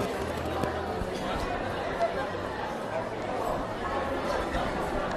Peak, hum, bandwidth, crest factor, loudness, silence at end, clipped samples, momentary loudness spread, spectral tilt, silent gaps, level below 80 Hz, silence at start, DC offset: -12 dBFS; none; 14 kHz; 18 dB; -31 LUFS; 0 s; under 0.1%; 3 LU; -5.5 dB/octave; none; -44 dBFS; 0 s; under 0.1%